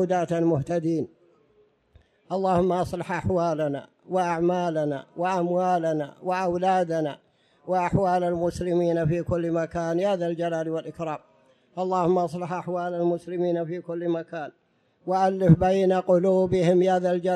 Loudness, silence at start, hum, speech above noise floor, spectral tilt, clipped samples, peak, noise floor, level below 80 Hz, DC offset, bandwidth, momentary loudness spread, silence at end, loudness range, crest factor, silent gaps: -25 LUFS; 0 s; none; 39 dB; -7.5 dB/octave; under 0.1%; -6 dBFS; -63 dBFS; -52 dBFS; under 0.1%; 11.5 kHz; 11 LU; 0 s; 4 LU; 18 dB; none